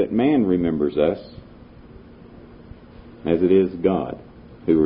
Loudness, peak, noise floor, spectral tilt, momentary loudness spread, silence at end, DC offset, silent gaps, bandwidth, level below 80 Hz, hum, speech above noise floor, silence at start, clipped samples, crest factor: -21 LUFS; -6 dBFS; -44 dBFS; -12 dB/octave; 15 LU; 0 s; under 0.1%; none; 5.2 kHz; -46 dBFS; none; 24 dB; 0 s; under 0.1%; 16 dB